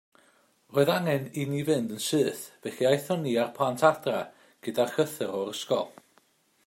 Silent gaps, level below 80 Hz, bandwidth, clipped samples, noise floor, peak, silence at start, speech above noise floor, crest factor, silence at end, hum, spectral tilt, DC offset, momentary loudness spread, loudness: none; -74 dBFS; 16 kHz; under 0.1%; -66 dBFS; -8 dBFS; 0.7 s; 38 dB; 22 dB; 0.75 s; none; -5 dB/octave; under 0.1%; 10 LU; -28 LUFS